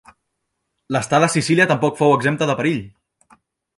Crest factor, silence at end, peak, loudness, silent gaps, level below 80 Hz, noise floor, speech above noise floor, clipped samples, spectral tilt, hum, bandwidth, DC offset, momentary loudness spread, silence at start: 18 dB; 0.9 s; -2 dBFS; -18 LUFS; none; -58 dBFS; -75 dBFS; 58 dB; under 0.1%; -5 dB/octave; none; 11.5 kHz; under 0.1%; 8 LU; 0.9 s